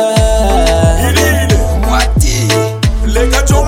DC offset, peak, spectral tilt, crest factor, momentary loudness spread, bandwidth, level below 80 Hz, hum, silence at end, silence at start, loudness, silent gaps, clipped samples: under 0.1%; 0 dBFS; -4.5 dB/octave; 10 dB; 3 LU; 16.5 kHz; -14 dBFS; none; 0 s; 0 s; -11 LUFS; none; 0.2%